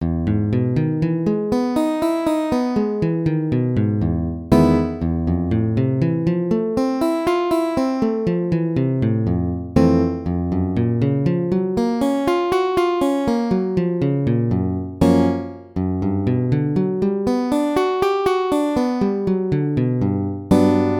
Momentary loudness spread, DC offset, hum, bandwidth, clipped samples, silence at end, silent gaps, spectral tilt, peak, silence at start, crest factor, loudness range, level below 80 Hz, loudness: 4 LU; under 0.1%; none; 17.5 kHz; under 0.1%; 0 s; none; -8.5 dB/octave; 0 dBFS; 0 s; 18 dB; 1 LU; -38 dBFS; -19 LUFS